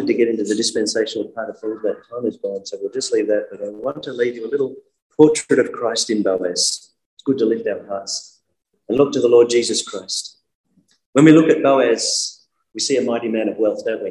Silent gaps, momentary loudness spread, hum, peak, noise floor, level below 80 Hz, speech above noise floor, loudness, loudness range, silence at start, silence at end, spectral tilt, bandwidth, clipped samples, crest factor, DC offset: 5.02-5.10 s, 7.06-7.17 s, 10.55-10.64 s, 11.06-11.13 s; 13 LU; none; 0 dBFS; -71 dBFS; -64 dBFS; 53 dB; -18 LUFS; 7 LU; 0 s; 0 s; -4 dB/octave; 12 kHz; under 0.1%; 18 dB; under 0.1%